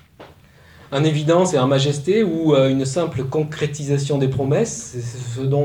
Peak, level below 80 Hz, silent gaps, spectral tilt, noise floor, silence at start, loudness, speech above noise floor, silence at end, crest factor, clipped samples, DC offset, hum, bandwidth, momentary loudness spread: -4 dBFS; -52 dBFS; none; -6 dB/octave; -47 dBFS; 0.2 s; -19 LUFS; 29 dB; 0 s; 16 dB; under 0.1%; under 0.1%; none; 11.5 kHz; 10 LU